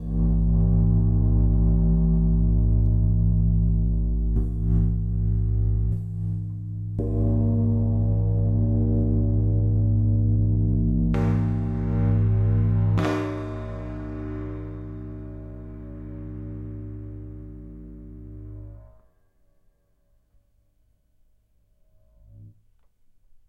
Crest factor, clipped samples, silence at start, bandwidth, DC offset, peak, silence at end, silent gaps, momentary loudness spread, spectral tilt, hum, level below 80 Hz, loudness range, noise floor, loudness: 12 dB; under 0.1%; 0 s; 3.9 kHz; under 0.1%; -10 dBFS; 1 s; none; 18 LU; -10.5 dB/octave; none; -28 dBFS; 17 LU; -64 dBFS; -23 LUFS